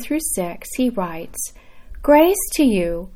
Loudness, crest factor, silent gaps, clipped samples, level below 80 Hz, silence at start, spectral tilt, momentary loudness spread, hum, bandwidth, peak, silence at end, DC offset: -19 LUFS; 18 dB; none; under 0.1%; -38 dBFS; 0 s; -4 dB/octave; 14 LU; none; 17.5 kHz; -2 dBFS; 0 s; under 0.1%